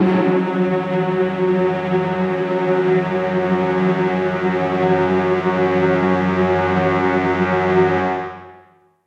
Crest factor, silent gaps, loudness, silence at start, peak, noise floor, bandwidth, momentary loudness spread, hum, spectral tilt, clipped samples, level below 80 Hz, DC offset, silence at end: 14 dB; none; -18 LUFS; 0 s; -4 dBFS; -50 dBFS; 7.4 kHz; 3 LU; none; -8.5 dB/octave; under 0.1%; -54 dBFS; under 0.1%; 0.5 s